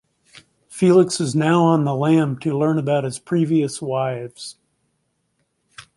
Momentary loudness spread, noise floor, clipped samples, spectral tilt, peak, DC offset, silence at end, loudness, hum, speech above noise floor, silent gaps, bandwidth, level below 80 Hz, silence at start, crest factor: 14 LU; -70 dBFS; under 0.1%; -6.5 dB/octave; -4 dBFS; under 0.1%; 0.15 s; -19 LUFS; none; 52 dB; none; 11.5 kHz; -64 dBFS; 0.7 s; 16 dB